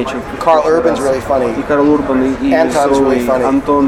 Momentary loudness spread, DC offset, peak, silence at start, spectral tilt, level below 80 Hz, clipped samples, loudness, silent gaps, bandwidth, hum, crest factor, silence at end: 4 LU; under 0.1%; 0 dBFS; 0 s; -6 dB/octave; -36 dBFS; under 0.1%; -13 LUFS; none; 14.5 kHz; none; 12 dB; 0 s